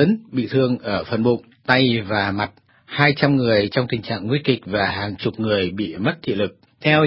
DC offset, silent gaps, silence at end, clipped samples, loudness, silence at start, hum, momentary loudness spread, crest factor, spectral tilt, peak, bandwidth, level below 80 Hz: under 0.1%; none; 0 s; under 0.1%; -20 LUFS; 0 s; none; 8 LU; 20 dB; -9 dB/octave; 0 dBFS; 5.8 kHz; -50 dBFS